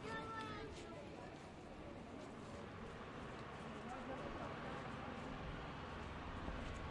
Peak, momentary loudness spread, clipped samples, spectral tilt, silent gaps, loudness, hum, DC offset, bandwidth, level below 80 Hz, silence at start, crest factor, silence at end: -32 dBFS; 6 LU; under 0.1%; -6 dB/octave; none; -50 LUFS; none; under 0.1%; 11 kHz; -60 dBFS; 0 s; 18 dB; 0 s